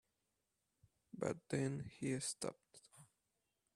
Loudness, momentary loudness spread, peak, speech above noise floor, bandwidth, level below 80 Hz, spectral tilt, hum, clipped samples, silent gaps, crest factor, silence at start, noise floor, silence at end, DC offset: -44 LUFS; 21 LU; -24 dBFS; 45 dB; 13.5 kHz; -78 dBFS; -5 dB/octave; none; under 0.1%; none; 24 dB; 1.15 s; -88 dBFS; 0.7 s; under 0.1%